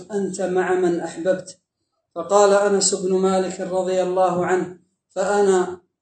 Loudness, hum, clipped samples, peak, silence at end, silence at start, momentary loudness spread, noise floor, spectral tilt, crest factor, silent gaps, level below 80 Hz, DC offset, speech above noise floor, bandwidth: -20 LUFS; none; under 0.1%; -4 dBFS; 0.25 s; 0 s; 10 LU; -75 dBFS; -4.5 dB/octave; 18 dB; none; -70 dBFS; under 0.1%; 56 dB; 9 kHz